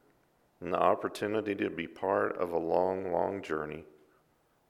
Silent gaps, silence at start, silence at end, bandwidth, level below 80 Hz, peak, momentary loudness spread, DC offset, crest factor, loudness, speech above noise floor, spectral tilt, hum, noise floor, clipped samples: none; 0.6 s; 0.85 s; 14.5 kHz; -68 dBFS; -12 dBFS; 8 LU; under 0.1%; 22 dB; -32 LUFS; 39 dB; -6.5 dB/octave; none; -70 dBFS; under 0.1%